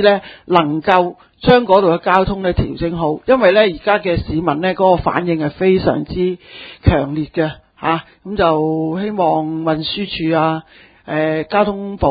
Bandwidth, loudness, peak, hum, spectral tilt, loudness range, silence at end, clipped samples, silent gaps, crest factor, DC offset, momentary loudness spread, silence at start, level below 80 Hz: 5.4 kHz; -16 LUFS; 0 dBFS; none; -9 dB/octave; 4 LU; 0 s; under 0.1%; none; 16 dB; under 0.1%; 8 LU; 0 s; -34 dBFS